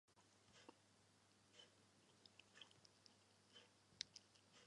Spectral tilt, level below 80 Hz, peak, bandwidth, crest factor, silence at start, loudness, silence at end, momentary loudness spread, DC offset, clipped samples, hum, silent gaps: -1.5 dB/octave; under -90 dBFS; -28 dBFS; 11 kHz; 40 dB; 0.05 s; -62 LUFS; 0 s; 13 LU; under 0.1%; under 0.1%; none; none